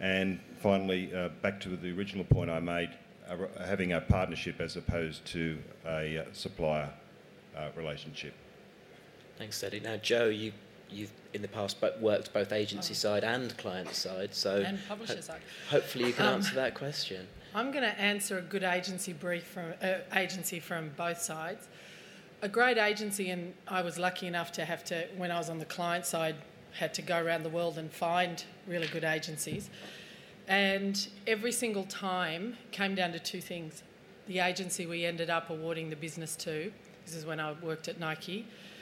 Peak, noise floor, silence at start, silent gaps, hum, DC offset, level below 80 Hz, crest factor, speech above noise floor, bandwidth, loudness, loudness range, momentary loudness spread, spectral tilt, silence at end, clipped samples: -12 dBFS; -56 dBFS; 0 s; none; none; under 0.1%; -56 dBFS; 22 dB; 22 dB; 16.5 kHz; -34 LUFS; 5 LU; 14 LU; -4 dB/octave; 0 s; under 0.1%